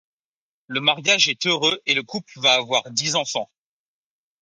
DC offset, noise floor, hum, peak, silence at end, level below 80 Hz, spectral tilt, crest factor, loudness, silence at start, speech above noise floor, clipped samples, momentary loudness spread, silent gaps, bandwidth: under 0.1%; under -90 dBFS; none; -2 dBFS; 0.95 s; -72 dBFS; -1.5 dB/octave; 22 dB; -19 LUFS; 0.7 s; over 68 dB; under 0.1%; 12 LU; none; 11 kHz